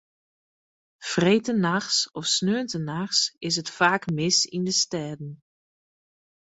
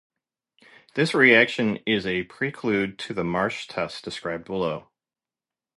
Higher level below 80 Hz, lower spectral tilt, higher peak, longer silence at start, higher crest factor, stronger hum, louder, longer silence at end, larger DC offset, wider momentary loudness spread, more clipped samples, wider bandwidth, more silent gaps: second, -66 dBFS vs -60 dBFS; second, -3 dB/octave vs -5.5 dB/octave; about the same, -4 dBFS vs -4 dBFS; about the same, 1 s vs 0.95 s; about the same, 22 dB vs 22 dB; neither; about the same, -23 LUFS vs -23 LUFS; first, 1.1 s vs 0.95 s; neither; second, 9 LU vs 15 LU; neither; second, 8.2 kHz vs 11.5 kHz; neither